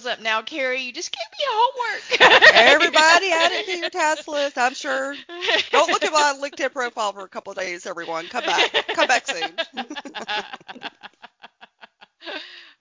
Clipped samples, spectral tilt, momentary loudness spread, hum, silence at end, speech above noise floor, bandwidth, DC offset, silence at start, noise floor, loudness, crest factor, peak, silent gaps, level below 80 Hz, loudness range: under 0.1%; -0.5 dB/octave; 20 LU; none; 0.2 s; 30 dB; 7.8 kHz; under 0.1%; 0 s; -50 dBFS; -18 LUFS; 20 dB; 0 dBFS; none; -64 dBFS; 11 LU